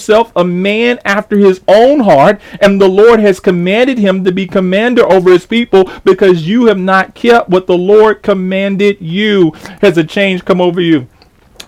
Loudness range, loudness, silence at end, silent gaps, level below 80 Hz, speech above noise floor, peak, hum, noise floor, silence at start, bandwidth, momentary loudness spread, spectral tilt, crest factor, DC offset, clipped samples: 2 LU; -9 LUFS; 0.6 s; none; -44 dBFS; 29 dB; 0 dBFS; none; -37 dBFS; 0 s; 13.5 kHz; 6 LU; -6.5 dB/octave; 8 dB; under 0.1%; under 0.1%